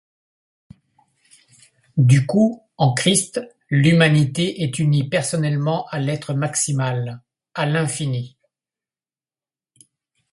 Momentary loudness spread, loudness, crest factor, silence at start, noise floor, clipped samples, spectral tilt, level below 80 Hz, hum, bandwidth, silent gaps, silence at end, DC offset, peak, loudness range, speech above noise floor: 12 LU; -19 LUFS; 20 dB; 1.95 s; under -90 dBFS; under 0.1%; -5 dB/octave; -58 dBFS; none; 11.5 kHz; none; 2.05 s; under 0.1%; 0 dBFS; 7 LU; over 72 dB